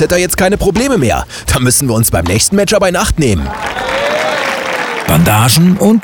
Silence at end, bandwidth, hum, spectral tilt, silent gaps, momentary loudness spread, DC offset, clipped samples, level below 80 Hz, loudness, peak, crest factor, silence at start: 0 s; 20 kHz; none; -4.5 dB/octave; none; 8 LU; under 0.1%; under 0.1%; -26 dBFS; -11 LUFS; 0 dBFS; 10 dB; 0 s